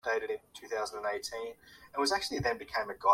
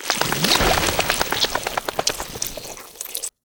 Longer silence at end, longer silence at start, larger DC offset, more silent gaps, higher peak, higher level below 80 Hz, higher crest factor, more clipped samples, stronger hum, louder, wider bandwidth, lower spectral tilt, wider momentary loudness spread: second, 0 s vs 0.25 s; about the same, 0.05 s vs 0 s; neither; neither; second, -12 dBFS vs 0 dBFS; second, -62 dBFS vs -38 dBFS; about the same, 20 dB vs 22 dB; neither; neither; second, -35 LUFS vs -21 LUFS; second, 16.5 kHz vs over 20 kHz; about the same, -3 dB/octave vs -2 dB/octave; about the same, 11 LU vs 13 LU